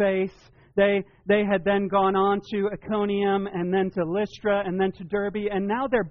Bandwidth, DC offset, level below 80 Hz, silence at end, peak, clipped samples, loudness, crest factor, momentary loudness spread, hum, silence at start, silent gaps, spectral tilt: 6.2 kHz; under 0.1%; -54 dBFS; 0 s; -10 dBFS; under 0.1%; -25 LUFS; 14 dB; 6 LU; none; 0 s; none; -5 dB/octave